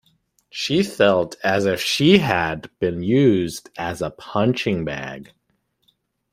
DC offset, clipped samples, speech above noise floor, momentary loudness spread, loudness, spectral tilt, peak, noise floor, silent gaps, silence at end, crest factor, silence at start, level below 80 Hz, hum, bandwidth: under 0.1%; under 0.1%; 49 dB; 13 LU; -20 LUFS; -5.5 dB/octave; -2 dBFS; -69 dBFS; none; 1.1 s; 20 dB; 0.55 s; -54 dBFS; none; 16 kHz